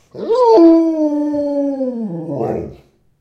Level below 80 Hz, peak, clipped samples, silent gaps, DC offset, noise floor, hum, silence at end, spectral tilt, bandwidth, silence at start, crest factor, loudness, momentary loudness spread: -52 dBFS; 0 dBFS; under 0.1%; none; under 0.1%; -44 dBFS; none; 0.45 s; -8.5 dB/octave; 6.4 kHz; 0.15 s; 14 dB; -14 LUFS; 15 LU